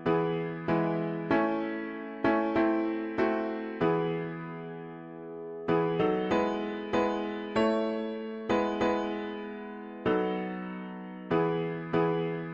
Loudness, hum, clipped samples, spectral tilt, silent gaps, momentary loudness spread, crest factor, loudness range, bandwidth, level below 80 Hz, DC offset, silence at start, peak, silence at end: -30 LUFS; none; under 0.1%; -7.5 dB/octave; none; 13 LU; 16 dB; 3 LU; 7.8 kHz; -60 dBFS; under 0.1%; 0 s; -14 dBFS; 0 s